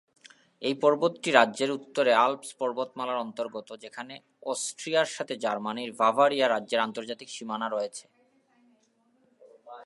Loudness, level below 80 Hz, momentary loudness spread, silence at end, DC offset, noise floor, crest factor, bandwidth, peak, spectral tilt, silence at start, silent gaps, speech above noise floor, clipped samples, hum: -27 LUFS; -86 dBFS; 18 LU; 0 s; under 0.1%; -68 dBFS; 26 dB; 11.5 kHz; -2 dBFS; -3 dB/octave; 0.6 s; none; 40 dB; under 0.1%; none